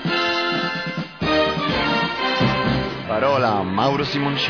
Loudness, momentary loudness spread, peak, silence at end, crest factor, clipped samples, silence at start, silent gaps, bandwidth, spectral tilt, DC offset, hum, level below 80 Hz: -20 LUFS; 5 LU; -6 dBFS; 0 s; 14 dB; under 0.1%; 0 s; none; 5.4 kHz; -6 dB/octave; 0.1%; none; -44 dBFS